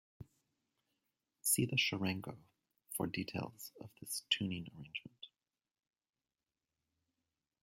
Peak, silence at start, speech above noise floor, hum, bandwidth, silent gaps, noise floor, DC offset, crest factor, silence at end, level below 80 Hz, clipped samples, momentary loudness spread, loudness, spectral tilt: -18 dBFS; 0.2 s; over 50 dB; none; 16.5 kHz; none; under -90 dBFS; under 0.1%; 26 dB; 2.35 s; -76 dBFS; under 0.1%; 18 LU; -38 LUFS; -3 dB/octave